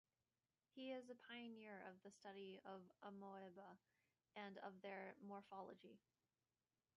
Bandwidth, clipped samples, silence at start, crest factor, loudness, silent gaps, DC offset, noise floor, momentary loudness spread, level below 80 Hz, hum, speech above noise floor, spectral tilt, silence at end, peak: 6 kHz; under 0.1%; 0.75 s; 18 dB; -59 LUFS; none; under 0.1%; under -90 dBFS; 8 LU; under -90 dBFS; none; over 32 dB; -3.5 dB/octave; 1 s; -42 dBFS